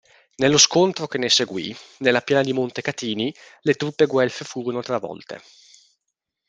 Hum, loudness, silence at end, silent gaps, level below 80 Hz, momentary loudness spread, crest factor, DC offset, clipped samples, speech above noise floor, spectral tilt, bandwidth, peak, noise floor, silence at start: none; -21 LUFS; 1.1 s; none; -64 dBFS; 15 LU; 22 dB; under 0.1%; under 0.1%; 59 dB; -3 dB/octave; 10 kHz; 0 dBFS; -80 dBFS; 0.4 s